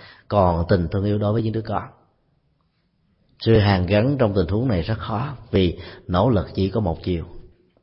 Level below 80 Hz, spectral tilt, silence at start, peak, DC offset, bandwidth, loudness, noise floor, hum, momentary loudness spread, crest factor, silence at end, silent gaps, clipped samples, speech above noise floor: -40 dBFS; -12 dB/octave; 0 s; -4 dBFS; under 0.1%; 5.8 kHz; -21 LUFS; -66 dBFS; none; 10 LU; 16 dB; 0.4 s; none; under 0.1%; 46 dB